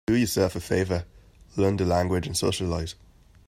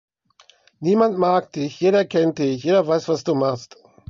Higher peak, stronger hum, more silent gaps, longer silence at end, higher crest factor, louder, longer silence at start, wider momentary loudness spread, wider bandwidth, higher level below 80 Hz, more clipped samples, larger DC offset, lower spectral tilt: second, -8 dBFS vs -4 dBFS; neither; neither; about the same, 0.55 s vs 0.45 s; about the same, 18 dB vs 16 dB; second, -26 LUFS vs -20 LUFS; second, 0.1 s vs 0.8 s; first, 13 LU vs 7 LU; first, 15.5 kHz vs 7.4 kHz; first, -48 dBFS vs -66 dBFS; neither; neither; about the same, -5.5 dB/octave vs -6.5 dB/octave